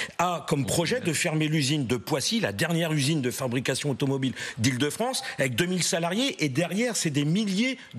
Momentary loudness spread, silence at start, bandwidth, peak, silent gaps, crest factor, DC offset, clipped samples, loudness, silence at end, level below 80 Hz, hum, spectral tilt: 3 LU; 0 s; 14.5 kHz; -12 dBFS; none; 14 dB; under 0.1%; under 0.1%; -26 LUFS; 0 s; -64 dBFS; none; -4 dB/octave